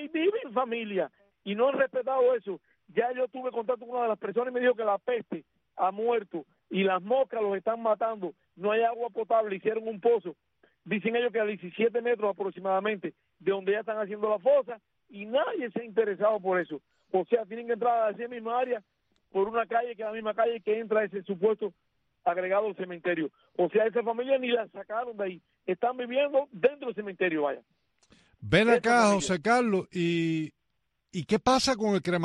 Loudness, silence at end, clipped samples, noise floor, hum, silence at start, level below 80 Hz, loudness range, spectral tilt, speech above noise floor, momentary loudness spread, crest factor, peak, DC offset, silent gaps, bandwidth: -29 LUFS; 0 s; under 0.1%; -80 dBFS; none; 0 s; -66 dBFS; 4 LU; -5 dB/octave; 52 dB; 11 LU; 18 dB; -10 dBFS; under 0.1%; none; 10.5 kHz